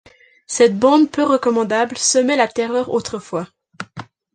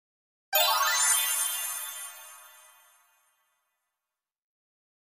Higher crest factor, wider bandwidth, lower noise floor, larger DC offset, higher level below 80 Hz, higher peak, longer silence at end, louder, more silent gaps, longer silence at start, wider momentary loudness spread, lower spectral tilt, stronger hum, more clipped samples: second, 16 dB vs 22 dB; second, 10 kHz vs 15.5 kHz; second, -37 dBFS vs -90 dBFS; neither; first, -60 dBFS vs -80 dBFS; first, -2 dBFS vs -10 dBFS; second, 0.3 s vs 2.65 s; first, -17 LUFS vs -25 LUFS; neither; about the same, 0.5 s vs 0.5 s; about the same, 19 LU vs 19 LU; first, -3.5 dB/octave vs 5 dB/octave; neither; neither